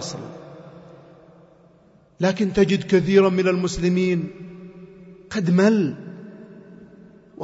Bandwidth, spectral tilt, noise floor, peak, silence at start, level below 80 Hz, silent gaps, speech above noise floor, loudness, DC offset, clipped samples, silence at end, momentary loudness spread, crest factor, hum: 8 kHz; -6.5 dB/octave; -54 dBFS; -4 dBFS; 0 s; -50 dBFS; none; 35 dB; -20 LUFS; under 0.1%; under 0.1%; 0 s; 24 LU; 20 dB; none